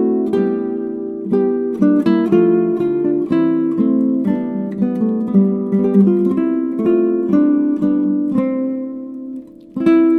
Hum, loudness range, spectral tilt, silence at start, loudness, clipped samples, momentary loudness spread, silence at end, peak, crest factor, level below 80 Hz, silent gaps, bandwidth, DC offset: none; 2 LU; -10.5 dB/octave; 0 s; -16 LUFS; under 0.1%; 10 LU; 0 s; -2 dBFS; 14 dB; -56 dBFS; none; 4.6 kHz; under 0.1%